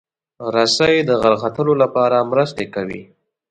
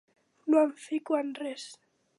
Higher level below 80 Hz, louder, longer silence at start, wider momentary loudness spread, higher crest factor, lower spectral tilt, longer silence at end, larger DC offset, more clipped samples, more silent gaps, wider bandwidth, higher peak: first, -54 dBFS vs -88 dBFS; first, -16 LUFS vs -29 LUFS; about the same, 0.4 s vs 0.45 s; second, 12 LU vs 16 LU; about the same, 16 dB vs 18 dB; about the same, -4.5 dB/octave vs -3.5 dB/octave; about the same, 0.45 s vs 0.45 s; neither; neither; neither; second, 9.2 kHz vs 11.5 kHz; first, 0 dBFS vs -14 dBFS